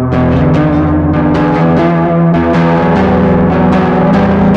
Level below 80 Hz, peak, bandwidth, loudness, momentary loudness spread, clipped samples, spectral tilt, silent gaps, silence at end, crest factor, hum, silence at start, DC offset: -26 dBFS; 0 dBFS; 6.6 kHz; -9 LUFS; 2 LU; under 0.1%; -9.5 dB/octave; none; 0 s; 8 dB; none; 0 s; under 0.1%